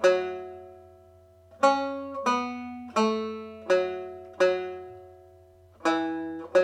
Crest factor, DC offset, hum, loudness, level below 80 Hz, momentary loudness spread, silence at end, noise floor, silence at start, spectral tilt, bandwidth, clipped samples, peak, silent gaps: 20 dB; under 0.1%; none; -28 LUFS; -72 dBFS; 18 LU; 0 s; -55 dBFS; 0 s; -4.5 dB/octave; 10.5 kHz; under 0.1%; -8 dBFS; none